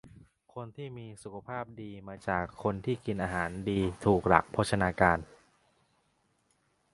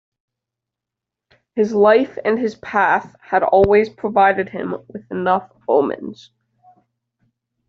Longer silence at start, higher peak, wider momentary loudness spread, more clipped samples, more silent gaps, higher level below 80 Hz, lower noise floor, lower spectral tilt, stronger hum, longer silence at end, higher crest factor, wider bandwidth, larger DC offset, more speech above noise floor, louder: second, 0.05 s vs 1.55 s; about the same, -4 dBFS vs -2 dBFS; first, 19 LU vs 14 LU; neither; neither; about the same, -52 dBFS vs -52 dBFS; second, -73 dBFS vs -85 dBFS; first, -6.5 dB/octave vs -4.5 dB/octave; neither; first, 1.7 s vs 1.55 s; first, 28 dB vs 16 dB; first, 11.5 kHz vs 6.8 kHz; neither; second, 42 dB vs 68 dB; second, -30 LUFS vs -17 LUFS